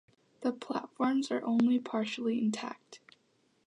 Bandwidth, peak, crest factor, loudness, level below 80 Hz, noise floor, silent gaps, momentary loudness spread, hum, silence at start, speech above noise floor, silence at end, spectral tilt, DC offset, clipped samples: 10.5 kHz; -16 dBFS; 18 dB; -32 LUFS; -86 dBFS; -72 dBFS; none; 11 LU; none; 0.4 s; 40 dB; 0.7 s; -5.5 dB/octave; under 0.1%; under 0.1%